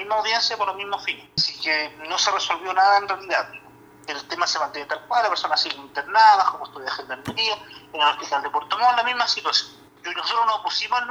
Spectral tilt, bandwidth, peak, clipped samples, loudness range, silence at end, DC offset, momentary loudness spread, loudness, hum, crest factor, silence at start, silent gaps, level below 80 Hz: -1 dB/octave; over 20 kHz; -4 dBFS; under 0.1%; 2 LU; 0 s; under 0.1%; 12 LU; -22 LUFS; none; 20 dB; 0 s; none; -66 dBFS